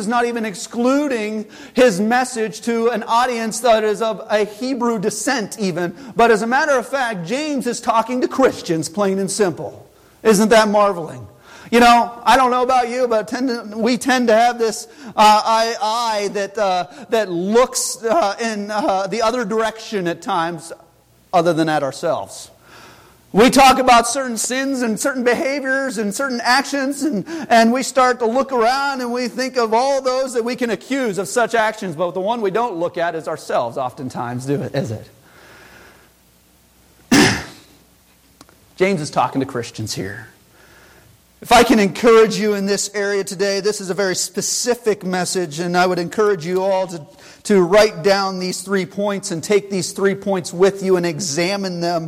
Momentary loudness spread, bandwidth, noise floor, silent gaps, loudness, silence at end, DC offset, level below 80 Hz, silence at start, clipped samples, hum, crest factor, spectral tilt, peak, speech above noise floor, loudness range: 11 LU; 16 kHz; -53 dBFS; none; -17 LUFS; 0 s; under 0.1%; -50 dBFS; 0 s; under 0.1%; none; 16 dB; -4 dB/octave; -2 dBFS; 36 dB; 6 LU